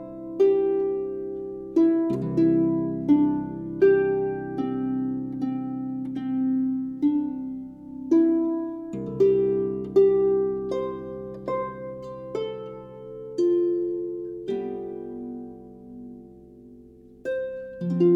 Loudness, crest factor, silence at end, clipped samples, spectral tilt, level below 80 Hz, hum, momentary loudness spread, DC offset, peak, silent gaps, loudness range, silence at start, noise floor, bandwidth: -25 LUFS; 16 dB; 0 s; under 0.1%; -9.5 dB/octave; -58 dBFS; none; 17 LU; under 0.1%; -8 dBFS; none; 9 LU; 0 s; -49 dBFS; 6.6 kHz